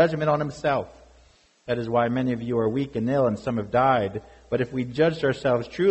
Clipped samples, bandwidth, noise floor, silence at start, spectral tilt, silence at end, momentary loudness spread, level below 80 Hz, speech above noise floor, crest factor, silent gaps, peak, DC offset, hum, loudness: under 0.1%; 8.2 kHz; -57 dBFS; 0 s; -7.5 dB/octave; 0 s; 9 LU; -54 dBFS; 34 dB; 16 dB; none; -8 dBFS; under 0.1%; none; -24 LUFS